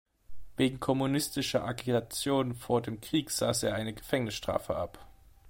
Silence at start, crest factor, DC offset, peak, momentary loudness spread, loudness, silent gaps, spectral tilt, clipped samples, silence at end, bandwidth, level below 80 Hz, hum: 0.3 s; 18 dB; under 0.1%; -12 dBFS; 6 LU; -31 LUFS; none; -4.5 dB/octave; under 0.1%; 0 s; 16.5 kHz; -56 dBFS; none